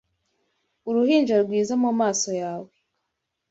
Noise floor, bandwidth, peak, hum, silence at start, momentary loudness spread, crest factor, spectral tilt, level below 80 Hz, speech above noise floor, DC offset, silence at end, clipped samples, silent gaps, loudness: -80 dBFS; 8 kHz; -8 dBFS; none; 0.85 s; 13 LU; 16 dB; -4 dB/octave; -70 dBFS; 58 dB; under 0.1%; 0.85 s; under 0.1%; none; -22 LUFS